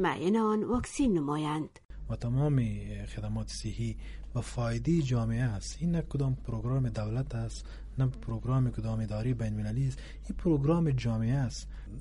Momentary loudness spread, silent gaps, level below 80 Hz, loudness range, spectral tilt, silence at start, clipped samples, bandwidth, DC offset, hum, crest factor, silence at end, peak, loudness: 11 LU; 1.85-1.89 s; -42 dBFS; 3 LU; -7 dB/octave; 0 s; under 0.1%; 11.5 kHz; under 0.1%; none; 14 dB; 0 s; -16 dBFS; -32 LUFS